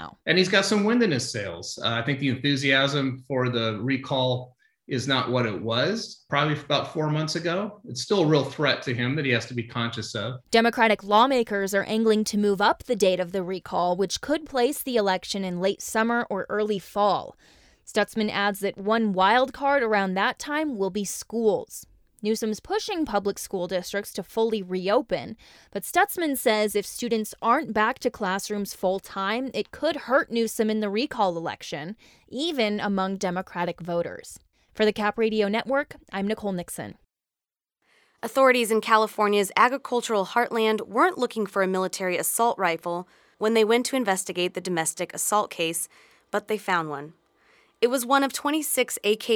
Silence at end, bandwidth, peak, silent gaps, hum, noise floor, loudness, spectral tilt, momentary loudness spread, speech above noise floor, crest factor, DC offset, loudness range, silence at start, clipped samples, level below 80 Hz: 0 s; over 20 kHz; -4 dBFS; none; none; under -90 dBFS; -25 LUFS; -4 dB/octave; 10 LU; over 65 dB; 22 dB; under 0.1%; 5 LU; 0 s; under 0.1%; -62 dBFS